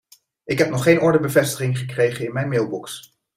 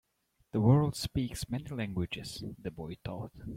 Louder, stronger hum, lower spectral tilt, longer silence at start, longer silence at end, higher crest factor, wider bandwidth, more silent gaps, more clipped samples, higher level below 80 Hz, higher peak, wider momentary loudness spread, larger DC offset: first, -20 LUFS vs -33 LUFS; neither; about the same, -5.5 dB/octave vs -6.5 dB/octave; about the same, 0.45 s vs 0.55 s; first, 0.35 s vs 0 s; about the same, 18 dB vs 22 dB; about the same, 16 kHz vs 16 kHz; neither; neither; about the same, -58 dBFS vs -54 dBFS; first, -2 dBFS vs -12 dBFS; second, 12 LU vs 16 LU; neither